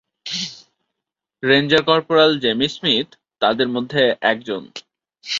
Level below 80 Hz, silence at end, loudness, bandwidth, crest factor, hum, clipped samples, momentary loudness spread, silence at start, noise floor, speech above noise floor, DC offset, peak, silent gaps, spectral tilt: -60 dBFS; 0 s; -18 LUFS; 7.6 kHz; 20 dB; none; under 0.1%; 15 LU; 0.25 s; -83 dBFS; 66 dB; under 0.1%; 0 dBFS; none; -4.5 dB/octave